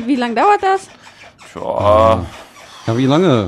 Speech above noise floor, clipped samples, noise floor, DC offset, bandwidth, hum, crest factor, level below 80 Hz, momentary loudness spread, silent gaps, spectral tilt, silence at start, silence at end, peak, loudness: 27 dB; under 0.1%; -40 dBFS; under 0.1%; 12.5 kHz; none; 14 dB; -42 dBFS; 18 LU; none; -6.5 dB/octave; 0 s; 0 s; 0 dBFS; -14 LUFS